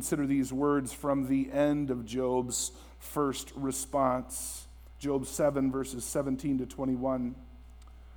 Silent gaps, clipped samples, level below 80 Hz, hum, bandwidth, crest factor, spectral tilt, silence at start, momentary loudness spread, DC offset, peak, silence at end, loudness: none; under 0.1%; -52 dBFS; none; over 20 kHz; 18 dB; -5 dB/octave; 0 s; 8 LU; under 0.1%; -14 dBFS; 0 s; -31 LUFS